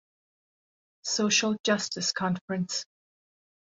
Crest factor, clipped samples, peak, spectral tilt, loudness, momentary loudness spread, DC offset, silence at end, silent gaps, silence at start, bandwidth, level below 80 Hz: 20 dB; under 0.1%; -10 dBFS; -3 dB/octave; -27 LUFS; 10 LU; under 0.1%; 0.85 s; 1.60-1.64 s, 2.41-2.48 s; 1.05 s; 8 kHz; -72 dBFS